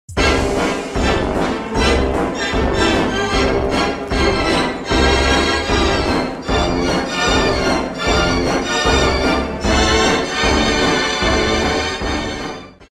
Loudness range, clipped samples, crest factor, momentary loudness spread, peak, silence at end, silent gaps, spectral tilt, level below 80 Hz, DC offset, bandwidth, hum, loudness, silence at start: 2 LU; under 0.1%; 16 dB; 5 LU; -2 dBFS; 0.15 s; none; -4 dB/octave; -26 dBFS; under 0.1%; 14 kHz; none; -16 LUFS; 0.1 s